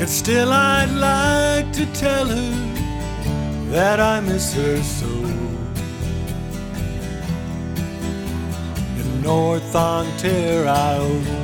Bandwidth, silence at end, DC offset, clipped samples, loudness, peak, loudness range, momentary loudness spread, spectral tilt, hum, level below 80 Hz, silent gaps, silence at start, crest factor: over 20 kHz; 0 s; under 0.1%; under 0.1%; -20 LUFS; -4 dBFS; 7 LU; 10 LU; -5 dB/octave; none; -32 dBFS; none; 0 s; 16 dB